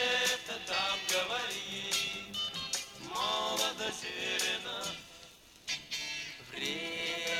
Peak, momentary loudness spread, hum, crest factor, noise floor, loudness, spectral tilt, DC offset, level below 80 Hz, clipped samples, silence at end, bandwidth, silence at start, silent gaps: -16 dBFS; 9 LU; none; 18 dB; -56 dBFS; -34 LUFS; -0.5 dB/octave; under 0.1%; -68 dBFS; under 0.1%; 0 s; 17.5 kHz; 0 s; none